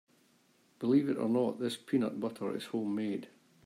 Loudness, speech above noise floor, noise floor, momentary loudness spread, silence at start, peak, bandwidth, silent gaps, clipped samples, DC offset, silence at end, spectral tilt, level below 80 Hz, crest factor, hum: -33 LUFS; 36 dB; -68 dBFS; 9 LU; 0.8 s; -16 dBFS; 14.5 kHz; none; under 0.1%; under 0.1%; 0.4 s; -6.5 dB/octave; -80 dBFS; 18 dB; none